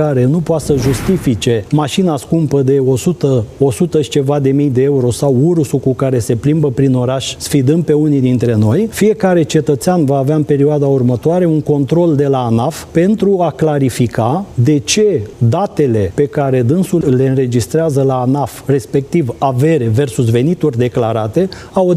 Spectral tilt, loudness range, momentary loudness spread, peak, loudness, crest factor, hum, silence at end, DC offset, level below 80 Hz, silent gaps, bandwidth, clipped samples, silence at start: -7 dB/octave; 1 LU; 3 LU; 0 dBFS; -13 LUFS; 12 dB; none; 0 s; under 0.1%; -40 dBFS; none; 15 kHz; under 0.1%; 0 s